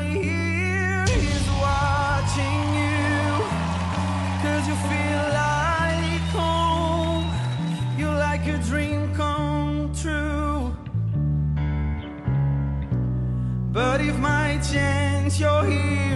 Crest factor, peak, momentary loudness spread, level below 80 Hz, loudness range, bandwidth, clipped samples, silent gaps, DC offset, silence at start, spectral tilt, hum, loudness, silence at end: 14 dB; -10 dBFS; 4 LU; -34 dBFS; 3 LU; 12 kHz; under 0.1%; none; under 0.1%; 0 s; -6 dB/octave; none; -23 LUFS; 0 s